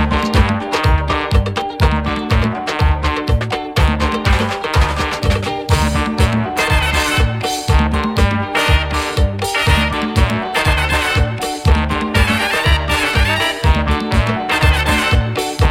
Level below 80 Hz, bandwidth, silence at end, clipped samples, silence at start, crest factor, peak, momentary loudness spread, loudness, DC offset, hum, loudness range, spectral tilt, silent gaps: -20 dBFS; 16.5 kHz; 0 s; under 0.1%; 0 s; 14 dB; 0 dBFS; 4 LU; -16 LUFS; under 0.1%; none; 2 LU; -5 dB/octave; none